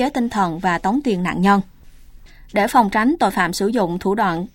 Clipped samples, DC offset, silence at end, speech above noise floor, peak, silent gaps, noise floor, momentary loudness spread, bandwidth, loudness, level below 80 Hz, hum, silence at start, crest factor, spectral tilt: under 0.1%; under 0.1%; 0.05 s; 24 dB; -2 dBFS; none; -42 dBFS; 5 LU; 17 kHz; -18 LUFS; -44 dBFS; none; 0 s; 18 dB; -5.5 dB/octave